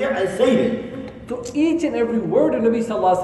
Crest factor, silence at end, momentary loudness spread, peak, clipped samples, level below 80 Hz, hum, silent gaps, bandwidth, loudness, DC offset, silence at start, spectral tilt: 14 dB; 0 s; 13 LU; -4 dBFS; under 0.1%; -50 dBFS; none; none; 11.5 kHz; -19 LUFS; under 0.1%; 0 s; -6 dB/octave